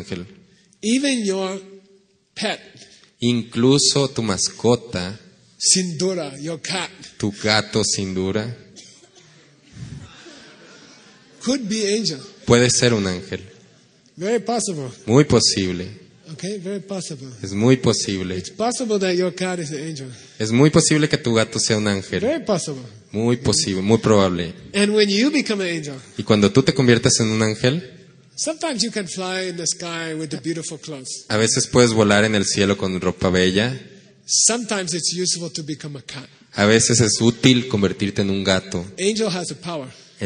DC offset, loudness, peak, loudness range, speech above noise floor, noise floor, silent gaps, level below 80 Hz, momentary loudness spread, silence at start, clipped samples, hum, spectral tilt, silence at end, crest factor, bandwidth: under 0.1%; -19 LUFS; 0 dBFS; 6 LU; 37 dB; -56 dBFS; none; -52 dBFS; 16 LU; 0 s; under 0.1%; none; -4 dB/octave; 0 s; 20 dB; 10 kHz